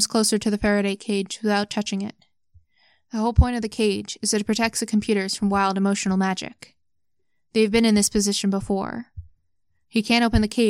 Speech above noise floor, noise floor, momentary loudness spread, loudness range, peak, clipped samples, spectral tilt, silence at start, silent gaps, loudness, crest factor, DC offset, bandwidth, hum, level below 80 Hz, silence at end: 59 dB; -81 dBFS; 9 LU; 3 LU; -2 dBFS; under 0.1%; -4.5 dB/octave; 0 s; none; -22 LUFS; 20 dB; under 0.1%; 15.5 kHz; none; -34 dBFS; 0 s